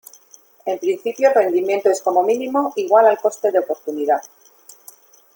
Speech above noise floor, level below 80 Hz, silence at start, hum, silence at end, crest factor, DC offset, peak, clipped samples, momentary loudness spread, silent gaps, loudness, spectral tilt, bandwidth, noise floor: 33 dB; -70 dBFS; 0.65 s; none; 1.1 s; 16 dB; under 0.1%; -2 dBFS; under 0.1%; 9 LU; none; -18 LUFS; -4 dB/octave; 17 kHz; -50 dBFS